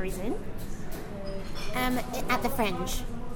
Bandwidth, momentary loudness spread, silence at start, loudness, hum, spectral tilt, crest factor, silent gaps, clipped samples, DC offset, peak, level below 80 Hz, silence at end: 17.5 kHz; 11 LU; 0 s; -32 LUFS; none; -4.5 dB/octave; 16 dB; none; under 0.1%; under 0.1%; -12 dBFS; -36 dBFS; 0 s